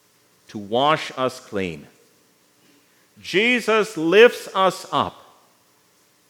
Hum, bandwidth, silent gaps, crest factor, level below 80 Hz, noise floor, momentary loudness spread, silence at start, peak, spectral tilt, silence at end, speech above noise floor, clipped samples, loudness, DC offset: 60 Hz at -55 dBFS; 18.5 kHz; none; 22 dB; -70 dBFS; -59 dBFS; 18 LU; 0.55 s; 0 dBFS; -4 dB/octave; 1.2 s; 40 dB; under 0.1%; -19 LUFS; under 0.1%